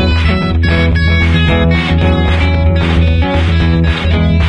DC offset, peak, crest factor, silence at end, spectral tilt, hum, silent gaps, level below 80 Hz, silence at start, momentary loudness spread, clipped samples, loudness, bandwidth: under 0.1%; 0 dBFS; 10 dB; 0 s; -7.5 dB/octave; none; none; -18 dBFS; 0 s; 2 LU; under 0.1%; -11 LUFS; 6.4 kHz